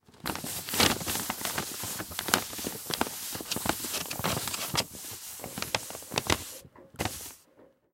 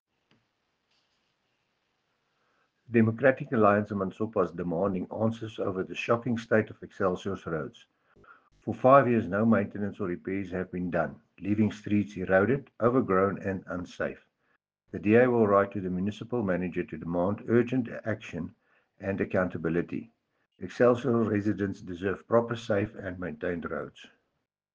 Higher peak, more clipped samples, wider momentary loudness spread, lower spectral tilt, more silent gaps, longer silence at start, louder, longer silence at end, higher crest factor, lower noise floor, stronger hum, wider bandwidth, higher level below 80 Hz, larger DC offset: first, 0 dBFS vs -6 dBFS; neither; about the same, 12 LU vs 12 LU; second, -2 dB/octave vs -8 dB/octave; neither; second, 0.1 s vs 2.9 s; second, -31 LUFS vs -28 LUFS; second, 0.3 s vs 0.7 s; first, 32 dB vs 22 dB; second, -60 dBFS vs -81 dBFS; neither; first, 17 kHz vs 7.4 kHz; first, -54 dBFS vs -62 dBFS; neither